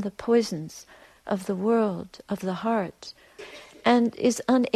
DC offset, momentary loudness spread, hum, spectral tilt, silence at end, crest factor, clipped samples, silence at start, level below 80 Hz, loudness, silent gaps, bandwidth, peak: under 0.1%; 21 LU; none; -5.5 dB/octave; 0.05 s; 16 dB; under 0.1%; 0 s; -64 dBFS; -26 LUFS; none; 14 kHz; -10 dBFS